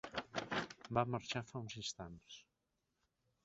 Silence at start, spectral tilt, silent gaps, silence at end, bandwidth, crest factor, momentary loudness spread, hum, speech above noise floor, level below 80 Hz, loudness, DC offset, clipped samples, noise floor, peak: 0.05 s; -3.5 dB/octave; none; 1.05 s; 8 kHz; 26 dB; 16 LU; none; 44 dB; -70 dBFS; -43 LUFS; under 0.1%; under 0.1%; -86 dBFS; -20 dBFS